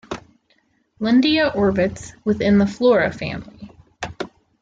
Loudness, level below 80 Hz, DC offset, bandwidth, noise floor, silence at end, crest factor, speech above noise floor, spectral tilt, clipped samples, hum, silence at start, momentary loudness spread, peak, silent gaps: -19 LUFS; -48 dBFS; under 0.1%; 7.8 kHz; -63 dBFS; 0.35 s; 16 dB; 45 dB; -6 dB/octave; under 0.1%; none; 0.1 s; 18 LU; -6 dBFS; none